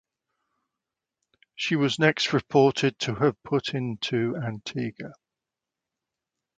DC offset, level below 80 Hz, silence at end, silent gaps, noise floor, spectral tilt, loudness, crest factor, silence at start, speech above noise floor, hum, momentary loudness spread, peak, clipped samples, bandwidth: under 0.1%; -64 dBFS; 1.45 s; none; -88 dBFS; -5.5 dB/octave; -25 LUFS; 22 dB; 1.6 s; 63 dB; none; 11 LU; -6 dBFS; under 0.1%; 9.2 kHz